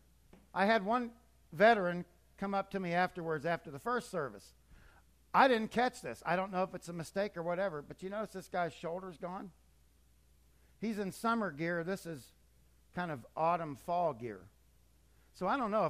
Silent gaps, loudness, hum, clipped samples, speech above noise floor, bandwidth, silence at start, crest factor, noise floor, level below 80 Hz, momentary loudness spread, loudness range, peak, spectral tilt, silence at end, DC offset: none; -35 LUFS; none; under 0.1%; 32 dB; 15 kHz; 0.55 s; 24 dB; -67 dBFS; -66 dBFS; 16 LU; 7 LU; -12 dBFS; -5.5 dB/octave; 0 s; under 0.1%